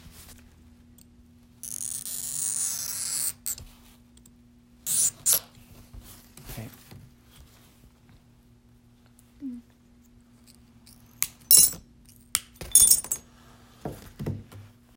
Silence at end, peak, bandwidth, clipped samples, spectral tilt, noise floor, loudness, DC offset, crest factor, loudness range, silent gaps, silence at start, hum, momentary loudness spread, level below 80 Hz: 0.3 s; 0 dBFS; 17 kHz; under 0.1%; -0.5 dB/octave; -57 dBFS; -22 LUFS; under 0.1%; 30 dB; 10 LU; none; 0.05 s; none; 26 LU; -54 dBFS